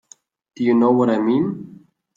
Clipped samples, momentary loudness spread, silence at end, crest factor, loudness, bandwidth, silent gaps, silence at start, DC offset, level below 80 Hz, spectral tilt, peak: under 0.1%; 10 LU; 0.5 s; 16 dB; -18 LUFS; 7.4 kHz; none; 0.6 s; under 0.1%; -66 dBFS; -8 dB/octave; -4 dBFS